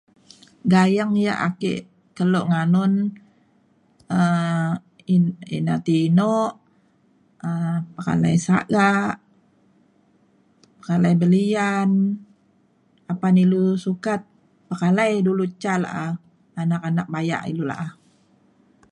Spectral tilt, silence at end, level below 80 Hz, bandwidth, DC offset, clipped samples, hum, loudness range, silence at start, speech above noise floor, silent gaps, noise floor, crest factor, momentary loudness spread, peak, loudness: -7.5 dB/octave; 1 s; -62 dBFS; 10.5 kHz; under 0.1%; under 0.1%; none; 2 LU; 0.65 s; 41 dB; none; -61 dBFS; 16 dB; 11 LU; -6 dBFS; -21 LUFS